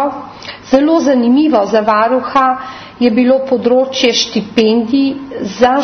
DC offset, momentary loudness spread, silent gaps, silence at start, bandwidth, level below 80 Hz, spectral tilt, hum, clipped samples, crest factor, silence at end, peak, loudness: under 0.1%; 12 LU; none; 0 s; 6.4 kHz; -50 dBFS; -4.5 dB/octave; none; under 0.1%; 12 dB; 0 s; 0 dBFS; -12 LUFS